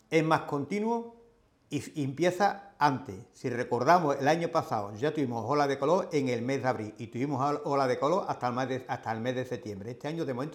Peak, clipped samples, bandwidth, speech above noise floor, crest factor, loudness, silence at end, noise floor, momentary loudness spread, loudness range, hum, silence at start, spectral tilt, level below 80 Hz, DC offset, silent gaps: -8 dBFS; under 0.1%; 16.5 kHz; 34 dB; 22 dB; -30 LUFS; 0 s; -63 dBFS; 11 LU; 3 LU; none; 0.1 s; -6 dB/octave; -72 dBFS; under 0.1%; none